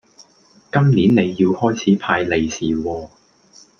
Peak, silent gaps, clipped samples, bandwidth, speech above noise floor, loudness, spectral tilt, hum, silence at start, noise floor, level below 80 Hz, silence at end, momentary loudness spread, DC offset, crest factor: -2 dBFS; none; under 0.1%; 7 kHz; 36 dB; -17 LUFS; -6.5 dB/octave; none; 0.2 s; -52 dBFS; -50 dBFS; 0.75 s; 9 LU; under 0.1%; 16 dB